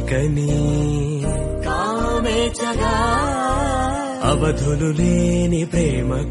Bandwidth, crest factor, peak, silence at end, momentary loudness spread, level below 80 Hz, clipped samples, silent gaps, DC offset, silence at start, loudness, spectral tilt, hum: 11.5 kHz; 14 dB; -4 dBFS; 0 s; 4 LU; -26 dBFS; under 0.1%; none; under 0.1%; 0 s; -20 LUFS; -6 dB/octave; none